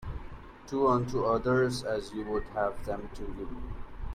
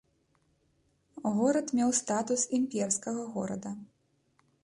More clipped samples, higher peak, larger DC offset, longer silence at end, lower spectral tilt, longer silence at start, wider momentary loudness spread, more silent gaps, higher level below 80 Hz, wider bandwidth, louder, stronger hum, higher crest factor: neither; about the same, -14 dBFS vs -16 dBFS; neither; second, 0 s vs 0.75 s; first, -6.5 dB/octave vs -4 dB/octave; second, 0 s vs 1.15 s; first, 18 LU vs 10 LU; neither; first, -44 dBFS vs -72 dBFS; first, 14.5 kHz vs 11.5 kHz; about the same, -31 LUFS vs -30 LUFS; neither; about the same, 18 dB vs 16 dB